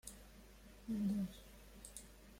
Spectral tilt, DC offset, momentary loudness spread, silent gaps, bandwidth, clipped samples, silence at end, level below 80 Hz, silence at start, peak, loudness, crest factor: -6 dB/octave; under 0.1%; 21 LU; none; 16.5 kHz; under 0.1%; 0 s; -62 dBFS; 0.05 s; -30 dBFS; -45 LUFS; 16 dB